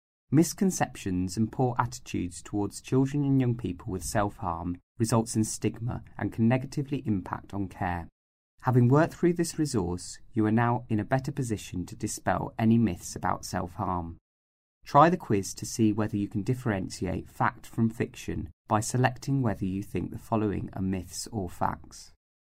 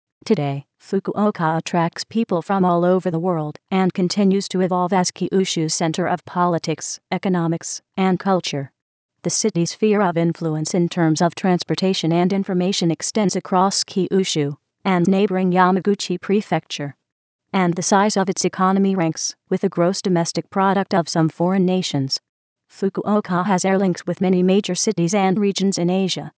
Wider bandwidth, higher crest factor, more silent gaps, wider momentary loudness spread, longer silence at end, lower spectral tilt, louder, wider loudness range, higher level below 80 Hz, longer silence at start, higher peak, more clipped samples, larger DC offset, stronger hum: first, 16 kHz vs 8 kHz; first, 22 dB vs 16 dB; first, 4.83-4.95 s, 8.12-8.58 s, 14.21-14.81 s, 18.53-18.65 s vs 8.82-9.09 s, 17.12-17.39 s, 22.29-22.56 s; first, 10 LU vs 7 LU; first, 0.5 s vs 0.1 s; about the same, -6 dB/octave vs -5 dB/octave; second, -29 LUFS vs -20 LUFS; about the same, 3 LU vs 2 LU; first, -52 dBFS vs -70 dBFS; about the same, 0.3 s vs 0.25 s; second, -6 dBFS vs -2 dBFS; neither; neither; neither